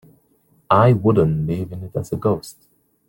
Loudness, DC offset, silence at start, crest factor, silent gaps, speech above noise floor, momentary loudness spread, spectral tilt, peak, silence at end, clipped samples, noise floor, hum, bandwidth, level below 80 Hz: -19 LUFS; under 0.1%; 0.7 s; 18 dB; none; 42 dB; 13 LU; -8.5 dB/octave; 0 dBFS; 0.6 s; under 0.1%; -60 dBFS; none; 17 kHz; -48 dBFS